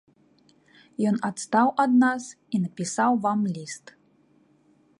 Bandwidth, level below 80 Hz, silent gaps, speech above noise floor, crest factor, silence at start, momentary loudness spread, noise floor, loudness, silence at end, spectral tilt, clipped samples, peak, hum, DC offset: 11 kHz; -72 dBFS; none; 38 dB; 20 dB; 1 s; 15 LU; -62 dBFS; -24 LUFS; 1.2 s; -5.5 dB/octave; under 0.1%; -6 dBFS; none; under 0.1%